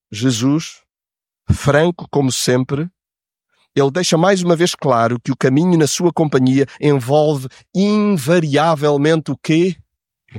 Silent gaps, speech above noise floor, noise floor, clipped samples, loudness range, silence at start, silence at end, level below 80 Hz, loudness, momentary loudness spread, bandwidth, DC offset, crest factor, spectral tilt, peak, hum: none; 75 dB; -90 dBFS; under 0.1%; 3 LU; 0.1 s; 0 s; -46 dBFS; -16 LUFS; 7 LU; 17 kHz; under 0.1%; 14 dB; -5.5 dB/octave; -2 dBFS; none